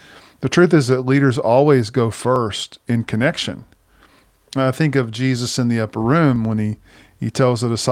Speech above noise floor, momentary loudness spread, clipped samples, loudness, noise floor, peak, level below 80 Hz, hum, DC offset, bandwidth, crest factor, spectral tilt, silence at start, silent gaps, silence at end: 36 dB; 12 LU; under 0.1%; -18 LUFS; -53 dBFS; 0 dBFS; -52 dBFS; none; under 0.1%; 15 kHz; 16 dB; -6 dB/octave; 0.4 s; none; 0 s